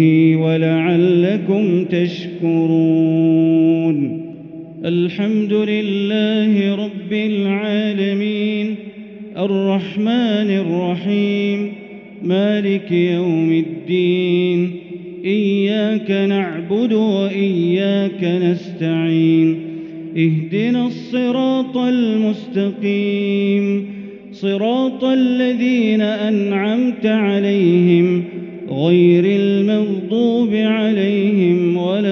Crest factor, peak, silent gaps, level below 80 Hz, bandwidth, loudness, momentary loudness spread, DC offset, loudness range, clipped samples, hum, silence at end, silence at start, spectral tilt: 14 dB; -2 dBFS; none; -66 dBFS; 6.4 kHz; -17 LUFS; 9 LU; under 0.1%; 4 LU; under 0.1%; none; 0 s; 0 s; -6.5 dB/octave